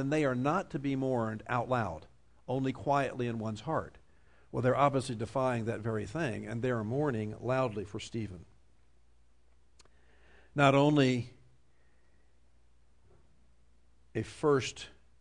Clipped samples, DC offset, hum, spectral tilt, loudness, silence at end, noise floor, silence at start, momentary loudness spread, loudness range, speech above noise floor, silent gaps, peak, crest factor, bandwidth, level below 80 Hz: under 0.1%; under 0.1%; none; -6.5 dB/octave; -32 LUFS; 0.3 s; -69 dBFS; 0 s; 13 LU; 6 LU; 37 dB; none; -12 dBFS; 20 dB; 10.5 kHz; -62 dBFS